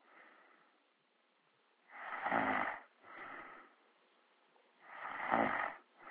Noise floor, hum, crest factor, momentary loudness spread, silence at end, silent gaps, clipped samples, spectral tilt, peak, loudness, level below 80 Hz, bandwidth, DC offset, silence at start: -76 dBFS; none; 26 dB; 21 LU; 0 s; none; under 0.1%; -2.5 dB/octave; -16 dBFS; -39 LUFS; -76 dBFS; 4 kHz; under 0.1%; 0.15 s